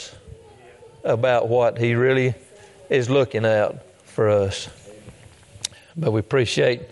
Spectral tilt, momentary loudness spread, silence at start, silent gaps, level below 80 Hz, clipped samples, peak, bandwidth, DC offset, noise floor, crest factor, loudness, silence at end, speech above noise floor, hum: -5.5 dB/octave; 13 LU; 0 s; none; -58 dBFS; under 0.1%; -6 dBFS; 11.5 kHz; under 0.1%; -47 dBFS; 16 dB; -21 LUFS; 0.05 s; 27 dB; none